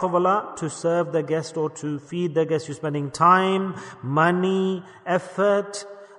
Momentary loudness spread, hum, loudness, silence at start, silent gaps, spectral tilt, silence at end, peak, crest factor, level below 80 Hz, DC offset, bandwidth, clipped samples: 12 LU; none; -23 LUFS; 0 s; none; -6 dB/octave; 0.05 s; -4 dBFS; 18 dB; -68 dBFS; under 0.1%; 11 kHz; under 0.1%